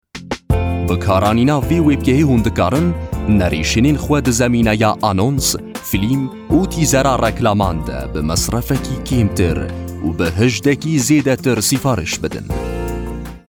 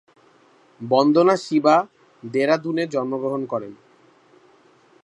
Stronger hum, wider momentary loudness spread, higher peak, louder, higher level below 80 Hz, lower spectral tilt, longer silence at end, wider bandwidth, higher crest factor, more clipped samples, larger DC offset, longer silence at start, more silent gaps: neither; second, 9 LU vs 19 LU; about the same, -2 dBFS vs -2 dBFS; first, -16 LUFS vs -20 LUFS; first, -30 dBFS vs -76 dBFS; about the same, -5.5 dB/octave vs -6 dB/octave; second, 0.15 s vs 1.3 s; first, 19.5 kHz vs 10.5 kHz; second, 14 dB vs 20 dB; neither; neither; second, 0.15 s vs 0.8 s; neither